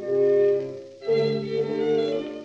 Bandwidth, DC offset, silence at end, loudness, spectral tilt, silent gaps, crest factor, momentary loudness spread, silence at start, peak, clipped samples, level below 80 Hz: 7.2 kHz; under 0.1%; 0 s; -24 LUFS; -7 dB/octave; none; 12 dB; 8 LU; 0 s; -12 dBFS; under 0.1%; -74 dBFS